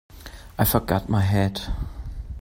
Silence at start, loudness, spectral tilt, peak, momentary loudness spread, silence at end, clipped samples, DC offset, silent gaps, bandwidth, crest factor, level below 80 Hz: 0.1 s; -23 LUFS; -6 dB/octave; -6 dBFS; 17 LU; 0 s; under 0.1%; under 0.1%; none; 16.5 kHz; 20 dB; -34 dBFS